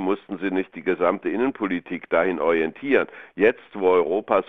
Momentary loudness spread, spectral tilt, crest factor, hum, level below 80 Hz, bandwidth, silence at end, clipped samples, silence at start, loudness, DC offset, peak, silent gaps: 6 LU; -8.5 dB/octave; 18 dB; none; -62 dBFS; 3.9 kHz; 0.05 s; under 0.1%; 0 s; -23 LUFS; 0.2%; -4 dBFS; none